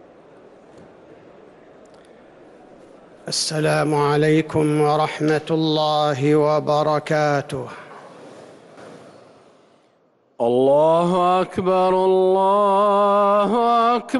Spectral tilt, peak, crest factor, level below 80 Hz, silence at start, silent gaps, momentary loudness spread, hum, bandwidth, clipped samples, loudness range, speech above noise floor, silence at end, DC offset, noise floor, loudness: -5.5 dB/octave; -8 dBFS; 12 dB; -60 dBFS; 3.25 s; none; 6 LU; none; 12 kHz; under 0.1%; 10 LU; 42 dB; 0 s; under 0.1%; -60 dBFS; -18 LUFS